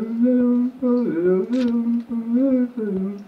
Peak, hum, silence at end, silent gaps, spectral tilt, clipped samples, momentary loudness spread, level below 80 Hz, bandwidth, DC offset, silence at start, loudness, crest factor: -10 dBFS; none; 0.05 s; none; -9 dB/octave; under 0.1%; 6 LU; -62 dBFS; 5.6 kHz; under 0.1%; 0 s; -20 LUFS; 10 dB